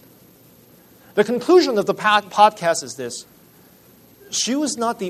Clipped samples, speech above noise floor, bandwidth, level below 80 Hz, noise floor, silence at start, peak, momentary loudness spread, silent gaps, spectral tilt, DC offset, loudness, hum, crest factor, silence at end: under 0.1%; 32 dB; 13.5 kHz; -66 dBFS; -50 dBFS; 1.15 s; -2 dBFS; 14 LU; none; -3 dB/octave; under 0.1%; -18 LUFS; none; 20 dB; 0 s